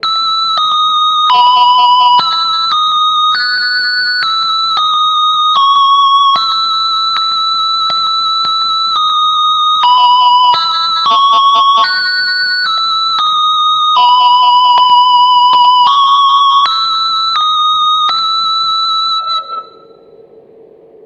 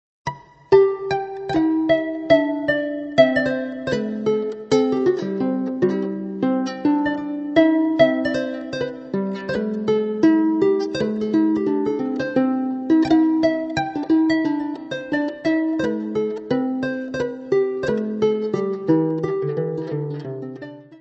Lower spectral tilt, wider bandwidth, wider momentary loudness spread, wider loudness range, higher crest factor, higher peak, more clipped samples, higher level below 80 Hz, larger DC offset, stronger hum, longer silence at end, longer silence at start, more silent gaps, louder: second, 0.5 dB/octave vs -7 dB/octave; about the same, 8.8 kHz vs 8 kHz; second, 4 LU vs 10 LU; about the same, 3 LU vs 3 LU; second, 10 dB vs 20 dB; about the same, 0 dBFS vs 0 dBFS; neither; second, -62 dBFS vs -56 dBFS; neither; neither; first, 1.4 s vs 0.05 s; second, 0.05 s vs 0.25 s; neither; first, -8 LUFS vs -21 LUFS